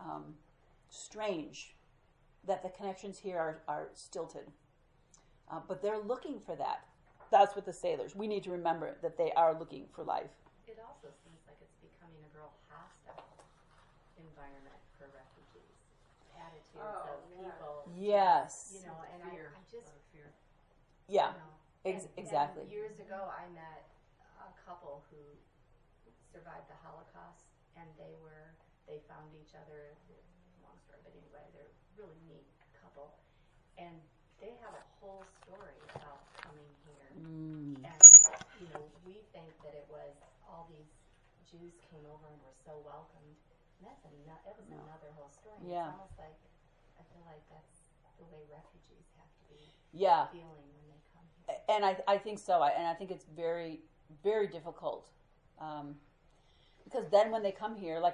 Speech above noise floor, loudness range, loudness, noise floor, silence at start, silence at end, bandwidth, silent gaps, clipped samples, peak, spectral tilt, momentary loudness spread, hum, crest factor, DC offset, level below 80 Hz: 34 dB; 30 LU; -26 LUFS; -68 dBFS; 0 s; 0 s; 11 kHz; none; under 0.1%; -4 dBFS; -1.5 dB/octave; 21 LU; none; 32 dB; under 0.1%; -70 dBFS